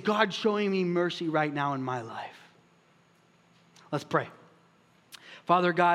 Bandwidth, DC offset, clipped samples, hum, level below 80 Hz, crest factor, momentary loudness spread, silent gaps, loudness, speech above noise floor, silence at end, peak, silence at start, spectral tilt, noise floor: 13 kHz; under 0.1%; under 0.1%; none; -82 dBFS; 22 dB; 17 LU; none; -28 LUFS; 36 dB; 0 s; -8 dBFS; 0 s; -6 dB/octave; -63 dBFS